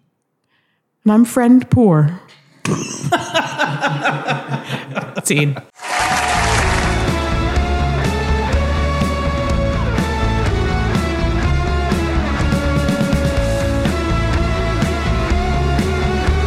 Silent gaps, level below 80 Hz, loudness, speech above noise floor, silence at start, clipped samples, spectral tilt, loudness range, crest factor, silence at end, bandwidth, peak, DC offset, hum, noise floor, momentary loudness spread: none; -22 dBFS; -17 LUFS; 51 dB; 1.05 s; under 0.1%; -5.5 dB/octave; 3 LU; 14 dB; 0 s; 14.5 kHz; -2 dBFS; under 0.1%; none; -66 dBFS; 8 LU